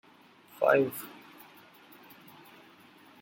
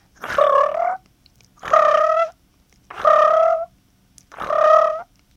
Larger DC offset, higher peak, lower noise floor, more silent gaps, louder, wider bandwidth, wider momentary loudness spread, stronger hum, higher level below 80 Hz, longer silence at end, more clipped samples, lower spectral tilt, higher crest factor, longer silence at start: neither; second, -10 dBFS vs -2 dBFS; about the same, -58 dBFS vs -57 dBFS; neither; second, -28 LUFS vs -17 LUFS; first, 17 kHz vs 10 kHz; first, 28 LU vs 17 LU; neither; second, -78 dBFS vs -58 dBFS; first, 2.1 s vs 0.35 s; neither; first, -5.5 dB/octave vs -3 dB/octave; first, 24 dB vs 18 dB; first, 0.6 s vs 0.2 s